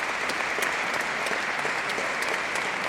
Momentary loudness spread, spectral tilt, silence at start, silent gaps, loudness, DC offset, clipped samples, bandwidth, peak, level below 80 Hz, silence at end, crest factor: 1 LU; -1.5 dB/octave; 0 s; none; -26 LUFS; under 0.1%; under 0.1%; 16 kHz; -12 dBFS; -62 dBFS; 0 s; 16 dB